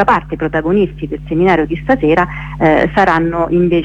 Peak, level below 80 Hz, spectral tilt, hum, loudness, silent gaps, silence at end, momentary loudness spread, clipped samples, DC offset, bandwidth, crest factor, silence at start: 0 dBFS; -32 dBFS; -8 dB/octave; none; -13 LUFS; none; 0 s; 7 LU; under 0.1%; under 0.1%; 7.8 kHz; 12 dB; 0 s